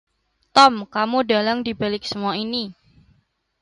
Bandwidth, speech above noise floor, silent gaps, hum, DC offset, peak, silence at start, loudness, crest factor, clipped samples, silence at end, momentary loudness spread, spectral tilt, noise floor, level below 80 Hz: 11.5 kHz; 44 dB; none; none; under 0.1%; 0 dBFS; 0.55 s; -19 LUFS; 22 dB; under 0.1%; 0.9 s; 11 LU; -4 dB/octave; -63 dBFS; -58 dBFS